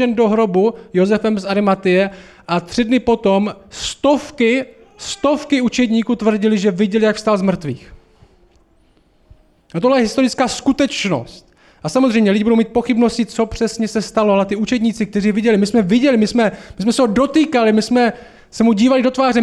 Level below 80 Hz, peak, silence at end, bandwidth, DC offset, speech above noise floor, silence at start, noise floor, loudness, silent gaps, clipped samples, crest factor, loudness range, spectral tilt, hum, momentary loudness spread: -46 dBFS; -4 dBFS; 0 s; 12 kHz; under 0.1%; 39 dB; 0 s; -54 dBFS; -16 LUFS; none; under 0.1%; 12 dB; 4 LU; -5.5 dB/octave; none; 8 LU